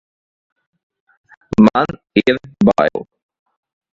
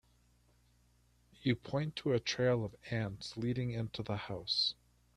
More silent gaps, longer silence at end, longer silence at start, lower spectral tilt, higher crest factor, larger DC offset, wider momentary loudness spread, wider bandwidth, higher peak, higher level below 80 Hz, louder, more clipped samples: neither; first, 0.95 s vs 0.45 s; first, 1.6 s vs 1.4 s; first, -7.5 dB/octave vs -5.5 dB/octave; about the same, 18 dB vs 20 dB; neither; about the same, 7 LU vs 8 LU; second, 7.4 kHz vs 11 kHz; first, 0 dBFS vs -18 dBFS; first, -48 dBFS vs -64 dBFS; first, -15 LUFS vs -36 LUFS; neither